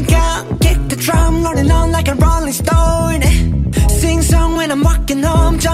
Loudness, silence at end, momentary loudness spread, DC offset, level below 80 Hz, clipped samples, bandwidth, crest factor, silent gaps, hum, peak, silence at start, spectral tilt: -14 LUFS; 0 s; 2 LU; under 0.1%; -14 dBFS; under 0.1%; 16 kHz; 12 dB; none; none; 0 dBFS; 0 s; -5.5 dB/octave